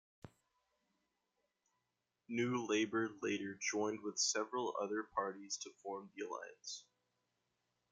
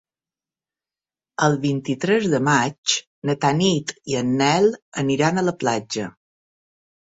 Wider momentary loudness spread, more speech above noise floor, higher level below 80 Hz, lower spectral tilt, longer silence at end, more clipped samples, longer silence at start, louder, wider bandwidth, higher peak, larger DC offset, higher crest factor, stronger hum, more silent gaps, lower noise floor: first, 12 LU vs 8 LU; second, 47 dB vs over 70 dB; second, -84 dBFS vs -60 dBFS; second, -3 dB/octave vs -4.5 dB/octave; about the same, 1.1 s vs 1.1 s; neither; second, 0.25 s vs 1.4 s; second, -40 LUFS vs -21 LUFS; first, 10 kHz vs 8 kHz; second, -24 dBFS vs -4 dBFS; neither; about the same, 20 dB vs 18 dB; neither; second, none vs 2.78-2.83 s, 3.07-3.22 s, 4.82-4.92 s; about the same, -88 dBFS vs under -90 dBFS